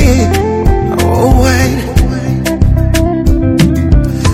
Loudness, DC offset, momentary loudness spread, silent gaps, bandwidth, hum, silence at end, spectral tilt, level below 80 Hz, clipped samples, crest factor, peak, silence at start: -11 LUFS; 0.3%; 4 LU; none; 16 kHz; none; 0 s; -6.5 dB/octave; -14 dBFS; 1%; 8 dB; 0 dBFS; 0 s